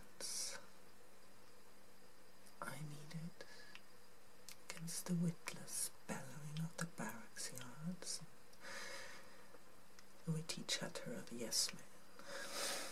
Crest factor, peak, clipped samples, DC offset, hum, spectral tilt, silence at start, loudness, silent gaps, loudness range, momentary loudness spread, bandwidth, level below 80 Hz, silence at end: 24 dB; -24 dBFS; under 0.1%; 0.3%; none; -3 dB/octave; 0 s; -46 LUFS; none; 11 LU; 23 LU; 16 kHz; -80 dBFS; 0 s